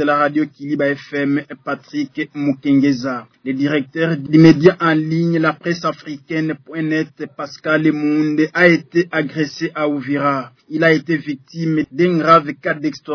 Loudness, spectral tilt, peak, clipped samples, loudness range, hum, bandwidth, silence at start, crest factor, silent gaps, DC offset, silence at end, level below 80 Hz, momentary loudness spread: -17 LUFS; -7 dB/octave; 0 dBFS; under 0.1%; 4 LU; none; 5.4 kHz; 0 s; 16 dB; none; under 0.1%; 0 s; -60 dBFS; 12 LU